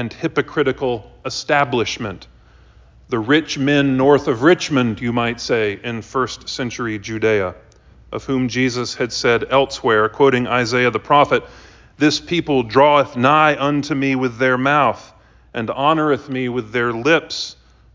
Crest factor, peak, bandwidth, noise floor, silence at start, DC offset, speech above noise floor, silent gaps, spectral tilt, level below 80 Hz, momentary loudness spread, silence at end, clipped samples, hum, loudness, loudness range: 18 dB; 0 dBFS; 7.6 kHz; -47 dBFS; 0 s; under 0.1%; 30 dB; none; -5 dB/octave; -48 dBFS; 11 LU; 0.4 s; under 0.1%; none; -17 LUFS; 6 LU